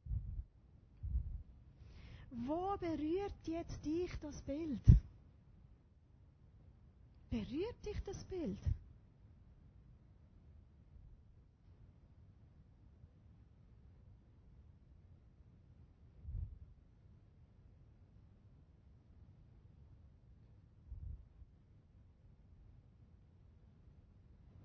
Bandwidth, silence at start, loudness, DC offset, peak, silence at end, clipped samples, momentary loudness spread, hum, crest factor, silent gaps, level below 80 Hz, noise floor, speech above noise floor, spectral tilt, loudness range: 6.4 kHz; 0.05 s; -41 LUFS; under 0.1%; -12 dBFS; 0 s; under 0.1%; 25 LU; none; 34 dB; none; -48 dBFS; -66 dBFS; 29 dB; -9 dB/octave; 27 LU